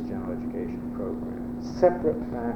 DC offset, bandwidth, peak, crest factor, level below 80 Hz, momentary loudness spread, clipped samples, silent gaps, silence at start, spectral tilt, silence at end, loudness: under 0.1%; 6.8 kHz; -8 dBFS; 20 dB; -46 dBFS; 11 LU; under 0.1%; none; 0 s; -8.5 dB/octave; 0 s; -28 LUFS